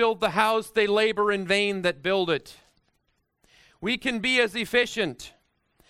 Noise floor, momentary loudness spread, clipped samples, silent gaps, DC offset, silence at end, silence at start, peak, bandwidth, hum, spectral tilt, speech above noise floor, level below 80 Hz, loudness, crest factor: -73 dBFS; 8 LU; under 0.1%; none; under 0.1%; 0.6 s; 0 s; -6 dBFS; 15.5 kHz; none; -4 dB/octave; 48 dB; -60 dBFS; -24 LUFS; 20 dB